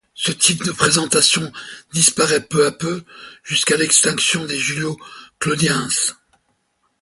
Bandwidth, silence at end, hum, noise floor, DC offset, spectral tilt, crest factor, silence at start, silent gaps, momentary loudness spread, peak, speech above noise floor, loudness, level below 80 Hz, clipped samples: 12 kHz; 0.9 s; none; -67 dBFS; under 0.1%; -2 dB/octave; 20 dB; 0.15 s; none; 13 LU; 0 dBFS; 48 dB; -16 LUFS; -56 dBFS; under 0.1%